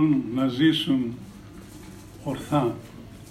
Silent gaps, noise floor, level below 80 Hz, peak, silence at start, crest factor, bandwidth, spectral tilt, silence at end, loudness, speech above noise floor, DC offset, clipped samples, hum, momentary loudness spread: none; -43 dBFS; -54 dBFS; -10 dBFS; 0 s; 16 dB; 14.5 kHz; -6.5 dB/octave; 0 s; -24 LUFS; 20 dB; under 0.1%; under 0.1%; none; 22 LU